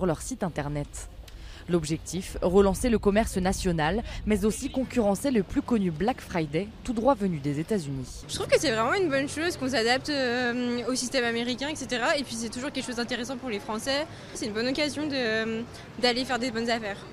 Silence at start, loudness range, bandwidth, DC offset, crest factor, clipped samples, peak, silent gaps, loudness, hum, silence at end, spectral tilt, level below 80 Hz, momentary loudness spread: 0 s; 4 LU; 15.5 kHz; under 0.1%; 18 dB; under 0.1%; -8 dBFS; none; -27 LUFS; none; 0 s; -4.5 dB/octave; -44 dBFS; 9 LU